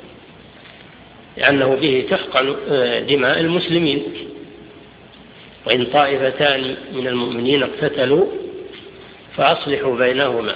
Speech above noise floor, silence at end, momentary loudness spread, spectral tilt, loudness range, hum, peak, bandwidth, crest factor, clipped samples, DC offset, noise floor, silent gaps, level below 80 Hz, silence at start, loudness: 25 dB; 0 s; 18 LU; -7.5 dB/octave; 3 LU; none; 0 dBFS; 5.2 kHz; 18 dB; under 0.1%; under 0.1%; -43 dBFS; none; -54 dBFS; 0 s; -17 LUFS